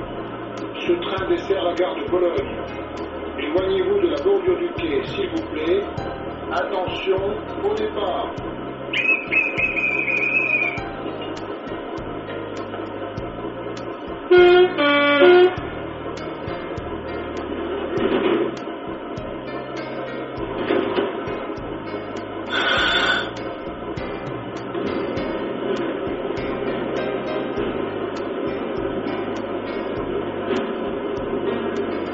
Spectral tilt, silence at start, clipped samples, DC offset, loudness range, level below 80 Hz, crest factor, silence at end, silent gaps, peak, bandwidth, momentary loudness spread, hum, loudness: -3 dB/octave; 0 s; under 0.1%; under 0.1%; 9 LU; -46 dBFS; 20 dB; 0 s; none; -2 dBFS; 7.6 kHz; 13 LU; none; -22 LUFS